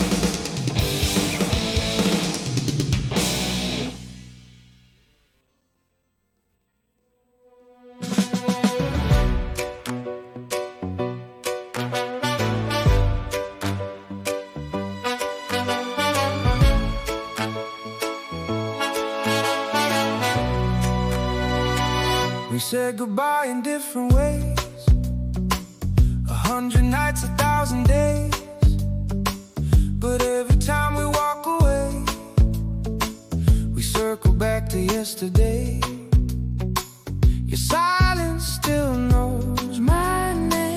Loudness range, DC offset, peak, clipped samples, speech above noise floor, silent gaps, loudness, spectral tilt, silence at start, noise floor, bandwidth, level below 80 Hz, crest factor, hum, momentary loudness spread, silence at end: 5 LU; under 0.1%; -6 dBFS; under 0.1%; 51 dB; none; -23 LUFS; -5 dB/octave; 0 s; -71 dBFS; 16.5 kHz; -28 dBFS; 16 dB; none; 9 LU; 0 s